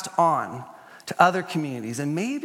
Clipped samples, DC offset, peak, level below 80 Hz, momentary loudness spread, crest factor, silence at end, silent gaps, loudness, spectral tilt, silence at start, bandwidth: under 0.1%; under 0.1%; 0 dBFS; -76 dBFS; 19 LU; 24 dB; 0 s; none; -24 LUFS; -5 dB/octave; 0 s; 16.5 kHz